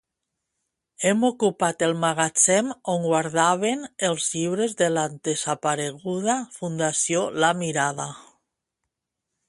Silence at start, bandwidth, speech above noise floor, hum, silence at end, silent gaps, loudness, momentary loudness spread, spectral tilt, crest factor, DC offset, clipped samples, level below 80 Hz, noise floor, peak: 1 s; 11.5 kHz; 60 dB; none; 1.25 s; none; -23 LUFS; 7 LU; -3.5 dB/octave; 20 dB; under 0.1%; under 0.1%; -68 dBFS; -83 dBFS; -4 dBFS